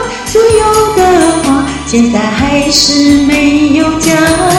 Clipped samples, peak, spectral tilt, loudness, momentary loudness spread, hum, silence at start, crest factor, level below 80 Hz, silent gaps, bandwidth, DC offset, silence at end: 0.7%; 0 dBFS; -4 dB/octave; -8 LUFS; 4 LU; none; 0 s; 8 dB; -28 dBFS; none; 16.5 kHz; under 0.1%; 0 s